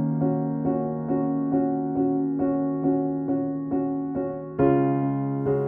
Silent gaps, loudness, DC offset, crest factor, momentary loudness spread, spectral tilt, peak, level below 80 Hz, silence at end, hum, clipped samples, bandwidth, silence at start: none; -25 LUFS; under 0.1%; 14 dB; 5 LU; -13.5 dB/octave; -10 dBFS; -56 dBFS; 0 s; none; under 0.1%; 3 kHz; 0 s